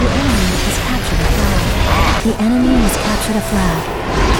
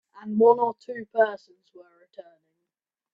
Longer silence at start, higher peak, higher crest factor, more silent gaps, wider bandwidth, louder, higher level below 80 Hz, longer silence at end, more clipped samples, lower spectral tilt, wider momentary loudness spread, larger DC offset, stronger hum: second, 0 s vs 0.15 s; first, 0 dBFS vs -6 dBFS; second, 12 dB vs 22 dB; neither; first, 19 kHz vs 5.4 kHz; first, -15 LUFS vs -23 LUFS; first, -18 dBFS vs -76 dBFS; second, 0 s vs 0.9 s; neither; second, -5 dB/octave vs -8 dB/octave; second, 4 LU vs 16 LU; neither; neither